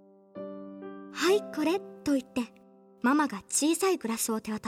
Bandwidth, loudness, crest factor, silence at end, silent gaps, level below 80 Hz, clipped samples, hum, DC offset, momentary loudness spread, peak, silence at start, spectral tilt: 16.5 kHz; -29 LUFS; 16 dB; 0 s; none; -70 dBFS; under 0.1%; none; under 0.1%; 17 LU; -14 dBFS; 0.35 s; -3 dB/octave